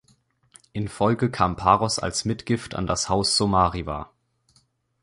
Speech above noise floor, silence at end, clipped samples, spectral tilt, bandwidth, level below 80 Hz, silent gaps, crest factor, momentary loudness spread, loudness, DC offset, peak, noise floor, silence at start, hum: 42 dB; 1 s; under 0.1%; -4.5 dB/octave; 11.5 kHz; -44 dBFS; none; 22 dB; 13 LU; -23 LUFS; under 0.1%; -2 dBFS; -65 dBFS; 0.75 s; none